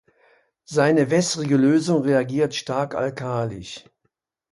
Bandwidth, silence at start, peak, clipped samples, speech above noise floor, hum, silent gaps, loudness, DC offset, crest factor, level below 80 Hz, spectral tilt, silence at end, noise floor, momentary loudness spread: 11.5 kHz; 0.7 s; -4 dBFS; under 0.1%; 53 dB; none; none; -21 LUFS; under 0.1%; 18 dB; -60 dBFS; -5.5 dB/octave; 0.75 s; -74 dBFS; 11 LU